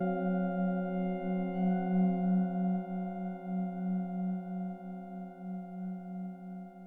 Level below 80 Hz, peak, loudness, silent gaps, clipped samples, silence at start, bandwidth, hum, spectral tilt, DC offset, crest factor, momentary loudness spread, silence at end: -70 dBFS; -20 dBFS; -34 LUFS; none; under 0.1%; 0 s; 3.4 kHz; none; -11.5 dB/octave; under 0.1%; 14 dB; 13 LU; 0 s